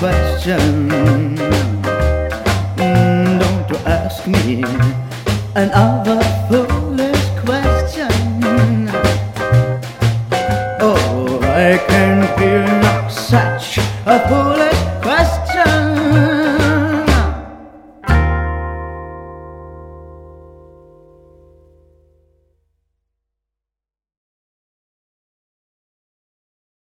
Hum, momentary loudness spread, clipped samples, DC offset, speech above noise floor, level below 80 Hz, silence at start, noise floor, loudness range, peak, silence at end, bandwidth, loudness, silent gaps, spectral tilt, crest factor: none; 8 LU; under 0.1%; under 0.1%; 74 dB; -26 dBFS; 0 s; -88 dBFS; 6 LU; 0 dBFS; 6.45 s; 16.5 kHz; -15 LUFS; none; -6.5 dB/octave; 16 dB